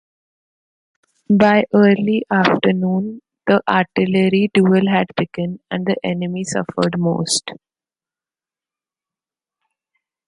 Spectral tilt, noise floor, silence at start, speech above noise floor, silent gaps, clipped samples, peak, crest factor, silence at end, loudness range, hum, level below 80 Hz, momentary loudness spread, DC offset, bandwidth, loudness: -5.5 dB/octave; under -90 dBFS; 1.3 s; over 74 dB; none; under 0.1%; 0 dBFS; 18 dB; 2.75 s; 8 LU; none; -58 dBFS; 10 LU; under 0.1%; 11.5 kHz; -17 LUFS